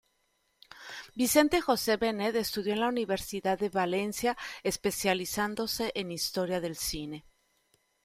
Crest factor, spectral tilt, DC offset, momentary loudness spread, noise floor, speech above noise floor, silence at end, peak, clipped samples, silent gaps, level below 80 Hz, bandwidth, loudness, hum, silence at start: 22 dB; -3.5 dB/octave; under 0.1%; 10 LU; -74 dBFS; 44 dB; 0.85 s; -8 dBFS; under 0.1%; none; -58 dBFS; 16 kHz; -30 LUFS; none; 0.75 s